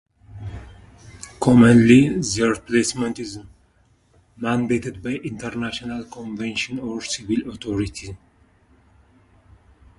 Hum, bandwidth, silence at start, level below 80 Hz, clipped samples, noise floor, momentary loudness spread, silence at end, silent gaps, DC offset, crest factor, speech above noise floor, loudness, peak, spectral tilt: none; 11.5 kHz; 0.3 s; -46 dBFS; under 0.1%; -59 dBFS; 23 LU; 1.8 s; none; under 0.1%; 20 dB; 40 dB; -20 LUFS; -2 dBFS; -5.5 dB/octave